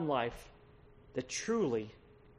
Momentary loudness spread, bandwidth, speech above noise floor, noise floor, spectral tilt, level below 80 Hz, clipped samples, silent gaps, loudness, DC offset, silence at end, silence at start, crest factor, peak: 18 LU; 11.5 kHz; 24 dB; -60 dBFS; -4.5 dB/octave; -62 dBFS; under 0.1%; none; -36 LUFS; under 0.1%; 0.1 s; 0 s; 18 dB; -20 dBFS